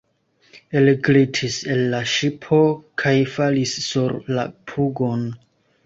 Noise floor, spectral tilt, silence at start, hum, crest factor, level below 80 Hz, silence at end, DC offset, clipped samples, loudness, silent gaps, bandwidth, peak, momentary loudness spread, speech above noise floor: -61 dBFS; -5.5 dB/octave; 0.55 s; none; 16 dB; -58 dBFS; 0.5 s; under 0.1%; under 0.1%; -20 LUFS; none; 8 kHz; -4 dBFS; 9 LU; 41 dB